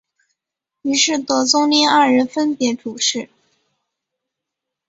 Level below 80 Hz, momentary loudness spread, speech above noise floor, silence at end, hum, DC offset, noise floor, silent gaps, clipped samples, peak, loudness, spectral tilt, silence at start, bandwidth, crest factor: -66 dBFS; 10 LU; 67 dB; 1.65 s; none; under 0.1%; -83 dBFS; none; under 0.1%; -2 dBFS; -16 LUFS; -1.5 dB/octave; 0.85 s; 8 kHz; 18 dB